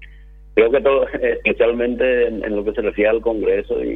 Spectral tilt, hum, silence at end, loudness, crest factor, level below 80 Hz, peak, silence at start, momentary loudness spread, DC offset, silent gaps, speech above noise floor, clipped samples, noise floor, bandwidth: -8 dB/octave; 50 Hz at -40 dBFS; 0 s; -18 LUFS; 18 dB; -40 dBFS; 0 dBFS; 0 s; 6 LU; under 0.1%; none; 24 dB; under 0.1%; -41 dBFS; 4 kHz